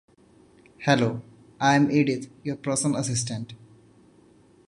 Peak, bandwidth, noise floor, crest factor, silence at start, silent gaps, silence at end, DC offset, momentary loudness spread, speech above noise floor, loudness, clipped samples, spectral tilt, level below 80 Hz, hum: -4 dBFS; 11.5 kHz; -56 dBFS; 22 dB; 0.8 s; none; 1.1 s; under 0.1%; 14 LU; 32 dB; -25 LUFS; under 0.1%; -5 dB/octave; -62 dBFS; none